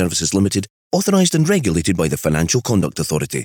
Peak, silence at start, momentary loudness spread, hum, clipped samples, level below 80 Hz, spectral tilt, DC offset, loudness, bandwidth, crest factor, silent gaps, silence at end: -4 dBFS; 0 s; 6 LU; none; under 0.1%; -40 dBFS; -4.5 dB/octave; under 0.1%; -17 LUFS; over 20 kHz; 14 dB; 0.70-0.91 s; 0 s